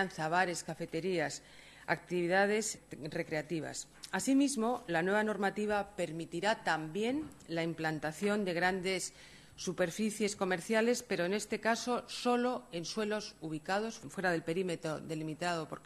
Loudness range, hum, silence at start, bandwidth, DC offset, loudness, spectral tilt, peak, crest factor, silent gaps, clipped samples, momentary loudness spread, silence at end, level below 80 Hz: 2 LU; none; 0 s; 13 kHz; under 0.1%; -35 LUFS; -4 dB/octave; -16 dBFS; 18 dB; none; under 0.1%; 10 LU; 0.05 s; -68 dBFS